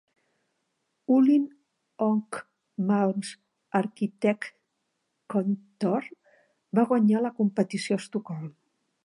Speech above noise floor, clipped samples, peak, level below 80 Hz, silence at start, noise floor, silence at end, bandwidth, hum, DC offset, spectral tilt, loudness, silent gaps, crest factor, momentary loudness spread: 53 dB; under 0.1%; -10 dBFS; -82 dBFS; 1.1 s; -78 dBFS; 0.55 s; 11 kHz; none; under 0.1%; -7 dB/octave; -27 LUFS; none; 18 dB; 17 LU